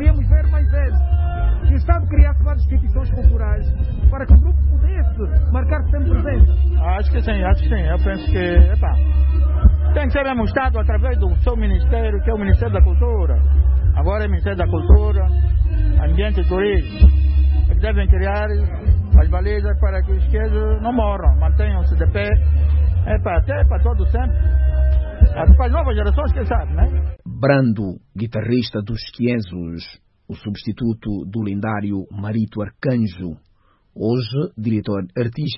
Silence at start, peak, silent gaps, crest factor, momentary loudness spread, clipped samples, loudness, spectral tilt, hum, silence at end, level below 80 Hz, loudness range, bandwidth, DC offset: 0 s; -2 dBFS; none; 14 dB; 9 LU; under 0.1%; -18 LUFS; -12.5 dB/octave; none; 0 s; -16 dBFS; 7 LU; 5.6 kHz; under 0.1%